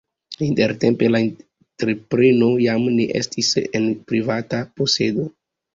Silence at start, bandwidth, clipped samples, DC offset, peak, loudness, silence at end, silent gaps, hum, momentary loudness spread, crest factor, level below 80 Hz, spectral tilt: 0.3 s; 7.6 kHz; under 0.1%; under 0.1%; -4 dBFS; -19 LUFS; 0.45 s; none; none; 10 LU; 16 dB; -56 dBFS; -5 dB/octave